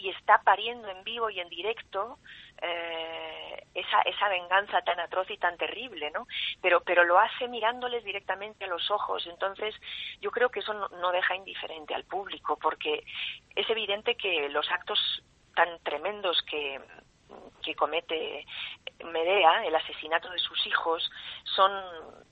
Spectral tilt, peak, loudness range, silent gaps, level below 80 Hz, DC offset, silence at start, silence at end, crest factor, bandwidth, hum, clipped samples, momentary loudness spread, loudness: -4 dB/octave; -6 dBFS; 5 LU; none; -68 dBFS; under 0.1%; 0 s; 0.1 s; 24 dB; 8 kHz; none; under 0.1%; 14 LU; -29 LUFS